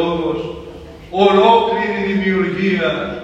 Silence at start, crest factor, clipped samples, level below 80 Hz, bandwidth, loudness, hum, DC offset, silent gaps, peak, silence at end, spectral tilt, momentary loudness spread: 0 s; 16 dB; under 0.1%; -44 dBFS; 8 kHz; -16 LUFS; none; under 0.1%; none; 0 dBFS; 0 s; -7 dB/octave; 18 LU